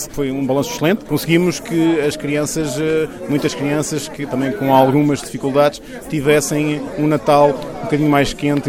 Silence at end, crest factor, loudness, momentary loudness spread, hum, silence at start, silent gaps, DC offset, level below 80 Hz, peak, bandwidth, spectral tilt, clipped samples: 0 s; 16 dB; -17 LUFS; 8 LU; none; 0 s; none; under 0.1%; -42 dBFS; -2 dBFS; 17 kHz; -5.5 dB/octave; under 0.1%